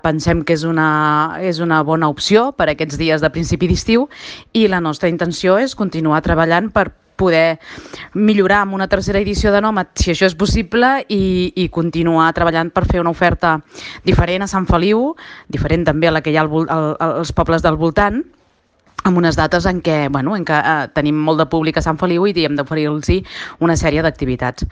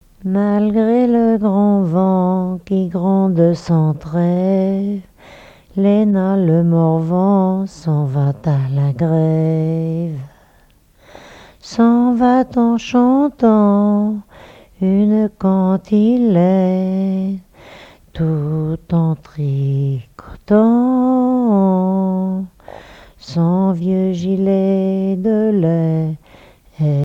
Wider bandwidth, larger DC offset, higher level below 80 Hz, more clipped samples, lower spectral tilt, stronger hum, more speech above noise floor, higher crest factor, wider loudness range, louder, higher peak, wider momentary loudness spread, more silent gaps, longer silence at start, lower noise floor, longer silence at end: first, 9.6 kHz vs 7.6 kHz; neither; first, -30 dBFS vs -48 dBFS; neither; second, -6 dB/octave vs -9.5 dB/octave; neither; first, 42 dB vs 37 dB; about the same, 16 dB vs 16 dB; second, 1 LU vs 4 LU; about the same, -15 LUFS vs -15 LUFS; about the same, 0 dBFS vs 0 dBFS; second, 5 LU vs 8 LU; neither; second, 0.05 s vs 0.2 s; first, -57 dBFS vs -51 dBFS; about the same, 0 s vs 0 s